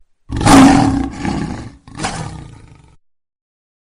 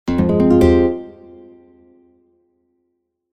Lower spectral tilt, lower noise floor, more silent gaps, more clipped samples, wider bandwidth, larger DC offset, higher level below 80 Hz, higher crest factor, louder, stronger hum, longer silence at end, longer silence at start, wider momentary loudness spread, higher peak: second, -5 dB/octave vs -9 dB/octave; second, -47 dBFS vs -71 dBFS; neither; first, 0.1% vs under 0.1%; first, 14.5 kHz vs 12 kHz; neither; about the same, -30 dBFS vs -34 dBFS; about the same, 16 dB vs 18 dB; about the same, -12 LUFS vs -14 LUFS; neither; second, 1.55 s vs 2.25 s; first, 0.3 s vs 0.05 s; first, 23 LU vs 17 LU; about the same, 0 dBFS vs 0 dBFS